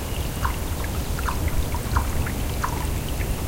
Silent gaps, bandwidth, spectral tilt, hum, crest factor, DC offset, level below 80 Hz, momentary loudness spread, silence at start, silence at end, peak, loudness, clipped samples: none; 17 kHz; -5 dB/octave; none; 16 dB; under 0.1%; -28 dBFS; 3 LU; 0 s; 0 s; -8 dBFS; -27 LUFS; under 0.1%